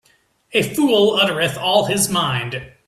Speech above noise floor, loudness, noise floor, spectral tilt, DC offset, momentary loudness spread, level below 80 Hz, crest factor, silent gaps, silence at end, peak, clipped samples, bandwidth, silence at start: 41 dB; -17 LUFS; -59 dBFS; -3.5 dB/octave; under 0.1%; 7 LU; -54 dBFS; 16 dB; none; 0.2 s; -2 dBFS; under 0.1%; 15.5 kHz; 0.55 s